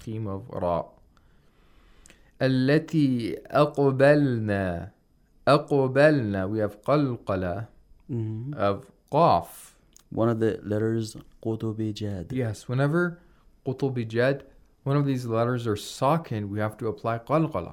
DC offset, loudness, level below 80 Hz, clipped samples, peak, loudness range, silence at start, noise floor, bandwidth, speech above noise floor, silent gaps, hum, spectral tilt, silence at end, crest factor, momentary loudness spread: under 0.1%; -26 LUFS; -58 dBFS; under 0.1%; -6 dBFS; 5 LU; 0 s; -60 dBFS; 16 kHz; 35 dB; none; none; -7.5 dB/octave; 0 s; 20 dB; 13 LU